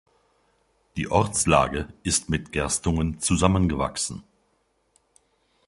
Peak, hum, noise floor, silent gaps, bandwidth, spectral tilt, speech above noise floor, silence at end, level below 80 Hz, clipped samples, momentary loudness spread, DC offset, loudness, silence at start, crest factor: -2 dBFS; none; -69 dBFS; none; 11.5 kHz; -4.5 dB/octave; 45 dB; 1.45 s; -38 dBFS; under 0.1%; 10 LU; under 0.1%; -24 LUFS; 0.95 s; 24 dB